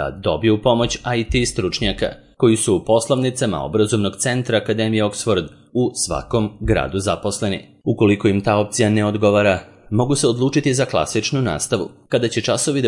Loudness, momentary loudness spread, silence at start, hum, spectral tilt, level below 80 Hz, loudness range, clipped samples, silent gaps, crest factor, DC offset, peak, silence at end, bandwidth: -19 LUFS; 6 LU; 0 s; none; -5 dB/octave; -38 dBFS; 3 LU; under 0.1%; none; 16 dB; under 0.1%; -2 dBFS; 0 s; 11.5 kHz